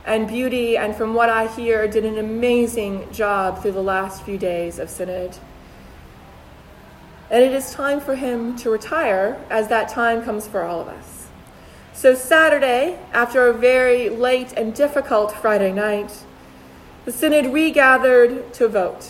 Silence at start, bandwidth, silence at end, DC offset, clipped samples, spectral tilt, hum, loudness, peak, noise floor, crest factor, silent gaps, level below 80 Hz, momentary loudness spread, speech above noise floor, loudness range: 0.05 s; 16 kHz; 0 s; under 0.1%; under 0.1%; -4 dB/octave; none; -18 LUFS; 0 dBFS; -43 dBFS; 18 dB; none; -48 dBFS; 13 LU; 25 dB; 8 LU